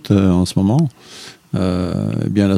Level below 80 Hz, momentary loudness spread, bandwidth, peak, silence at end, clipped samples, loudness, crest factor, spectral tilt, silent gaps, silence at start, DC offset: -44 dBFS; 20 LU; 14 kHz; 0 dBFS; 0 s; under 0.1%; -17 LUFS; 16 dB; -7.5 dB/octave; none; 0.05 s; under 0.1%